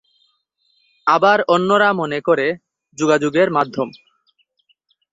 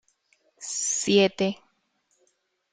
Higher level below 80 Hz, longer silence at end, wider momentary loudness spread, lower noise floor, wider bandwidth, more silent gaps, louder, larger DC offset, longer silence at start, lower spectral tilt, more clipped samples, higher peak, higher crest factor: about the same, -64 dBFS vs -68 dBFS; about the same, 1.2 s vs 1.2 s; second, 9 LU vs 18 LU; second, -65 dBFS vs -71 dBFS; second, 8 kHz vs 9.8 kHz; neither; first, -17 LUFS vs -24 LUFS; neither; first, 1.05 s vs 0.6 s; first, -5 dB/octave vs -3 dB/octave; neither; first, -2 dBFS vs -8 dBFS; about the same, 18 dB vs 20 dB